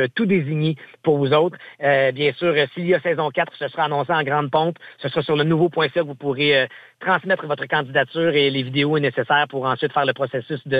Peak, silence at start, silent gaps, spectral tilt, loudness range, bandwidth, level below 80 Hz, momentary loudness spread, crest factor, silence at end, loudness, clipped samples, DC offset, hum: -4 dBFS; 0 s; none; -8 dB/octave; 1 LU; 8.2 kHz; -66 dBFS; 7 LU; 16 dB; 0 s; -20 LUFS; under 0.1%; under 0.1%; none